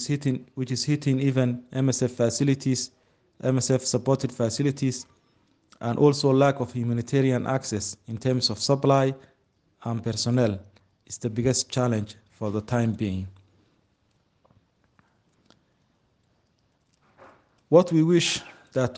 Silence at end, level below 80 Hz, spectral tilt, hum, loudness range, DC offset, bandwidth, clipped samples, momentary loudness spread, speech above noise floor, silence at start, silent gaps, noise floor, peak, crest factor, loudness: 0 s; -62 dBFS; -5.5 dB/octave; none; 6 LU; under 0.1%; 10 kHz; under 0.1%; 12 LU; 45 dB; 0 s; none; -69 dBFS; -4 dBFS; 22 dB; -25 LUFS